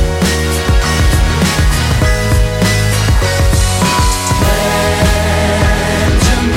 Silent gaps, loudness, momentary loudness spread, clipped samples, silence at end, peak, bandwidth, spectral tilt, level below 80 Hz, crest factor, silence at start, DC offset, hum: none; -12 LUFS; 1 LU; under 0.1%; 0 s; 0 dBFS; 16.5 kHz; -4.5 dB/octave; -16 dBFS; 10 dB; 0 s; under 0.1%; none